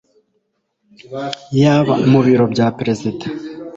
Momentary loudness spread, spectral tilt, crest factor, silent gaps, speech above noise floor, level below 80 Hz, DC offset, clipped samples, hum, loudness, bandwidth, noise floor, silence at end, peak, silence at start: 15 LU; -7.5 dB/octave; 16 dB; none; 53 dB; -52 dBFS; under 0.1%; under 0.1%; none; -15 LUFS; 8 kHz; -68 dBFS; 0 s; -2 dBFS; 1.1 s